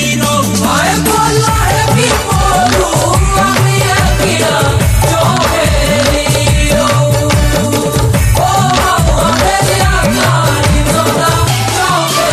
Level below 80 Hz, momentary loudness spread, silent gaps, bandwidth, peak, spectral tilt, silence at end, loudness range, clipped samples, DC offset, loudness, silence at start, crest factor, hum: -18 dBFS; 1 LU; none; 15.5 kHz; 0 dBFS; -4 dB/octave; 0 s; 0 LU; under 0.1%; under 0.1%; -10 LUFS; 0 s; 10 dB; none